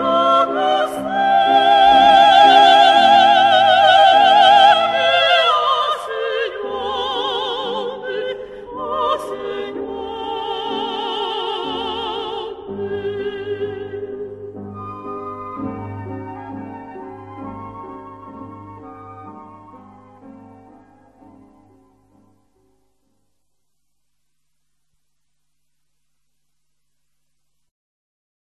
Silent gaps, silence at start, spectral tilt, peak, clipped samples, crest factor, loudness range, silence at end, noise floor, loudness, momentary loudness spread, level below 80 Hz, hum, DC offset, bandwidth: none; 0 s; -3.5 dB/octave; 0 dBFS; under 0.1%; 18 dB; 23 LU; 8.3 s; -76 dBFS; -15 LUFS; 24 LU; -54 dBFS; none; under 0.1%; 11.5 kHz